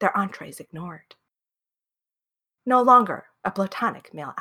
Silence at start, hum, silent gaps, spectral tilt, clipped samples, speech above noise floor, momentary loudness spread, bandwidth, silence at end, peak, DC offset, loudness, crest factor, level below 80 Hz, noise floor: 0 s; none; none; -6 dB/octave; under 0.1%; 67 dB; 22 LU; 16 kHz; 0 s; -4 dBFS; under 0.1%; -21 LUFS; 20 dB; -72 dBFS; -90 dBFS